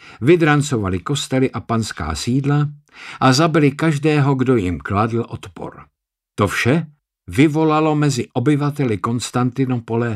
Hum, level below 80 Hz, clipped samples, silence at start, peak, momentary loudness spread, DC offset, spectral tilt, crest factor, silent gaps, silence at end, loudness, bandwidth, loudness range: none; -44 dBFS; under 0.1%; 0.05 s; -2 dBFS; 11 LU; under 0.1%; -6 dB/octave; 16 dB; none; 0 s; -18 LUFS; 13.5 kHz; 2 LU